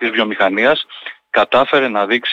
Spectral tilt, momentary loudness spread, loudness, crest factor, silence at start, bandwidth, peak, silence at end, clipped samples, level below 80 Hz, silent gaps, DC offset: -5 dB/octave; 7 LU; -15 LUFS; 12 dB; 0 s; 7.8 kHz; -4 dBFS; 0 s; under 0.1%; -56 dBFS; none; under 0.1%